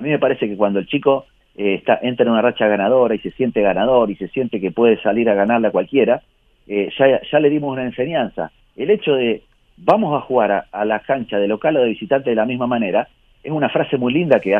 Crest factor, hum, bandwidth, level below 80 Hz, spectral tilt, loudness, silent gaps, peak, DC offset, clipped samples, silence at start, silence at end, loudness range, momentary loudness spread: 18 dB; none; 4.7 kHz; -54 dBFS; -8.5 dB/octave; -18 LUFS; none; 0 dBFS; under 0.1%; under 0.1%; 0 s; 0 s; 2 LU; 7 LU